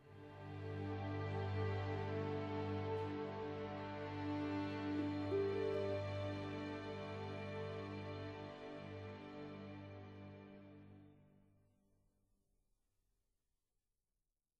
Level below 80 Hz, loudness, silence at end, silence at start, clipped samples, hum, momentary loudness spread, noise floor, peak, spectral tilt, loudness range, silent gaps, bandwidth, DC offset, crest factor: -74 dBFS; -45 LUFS; 3.3 s; 0 s; under 0.1%; none; 14 LU; under -90 dBFS; -30 dBFS; -8 dB/octave; 14 LU; none; 7.6 kHz; under 0.1%; 16 dB